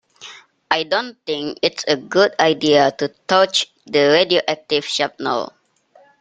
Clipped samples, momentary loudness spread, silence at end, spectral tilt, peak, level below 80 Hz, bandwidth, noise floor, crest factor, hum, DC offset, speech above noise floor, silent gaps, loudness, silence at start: under 0.1%; 11 LU; 0.75 s; -3.5 dB/octave; 0 dBFS; -62 dBFS; 9.4 kHz; -53 dBFS; 18 dB; none; under 0.1%; 36 dB; none; -18 LUFS; 0.2 s